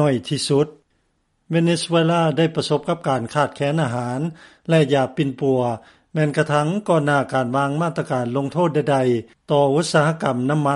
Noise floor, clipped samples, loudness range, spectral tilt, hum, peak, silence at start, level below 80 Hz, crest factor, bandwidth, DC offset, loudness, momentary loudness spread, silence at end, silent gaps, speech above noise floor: -67 dBFS; under 0.1%; 1 LU; -6 dB/octave; none; -4 dBFS; 0 s; -60 dBFS; 16 dB; 11.5 kHz; under 0.1%; -20 LUFS; 7 LU; 0 s; none; 48 dB